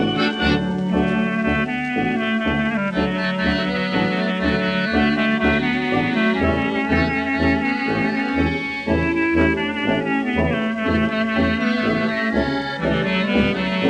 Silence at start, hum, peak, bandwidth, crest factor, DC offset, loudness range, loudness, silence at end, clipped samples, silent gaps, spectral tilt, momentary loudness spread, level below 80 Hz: 0 s; none; -6 dBFS; 9.6 kHz; 14 dB; under 0.1%; 1 LU; -20 LUFS; 0 s; under 0.1%; none; -7 dB/octave; 3 LU; -36 dBFS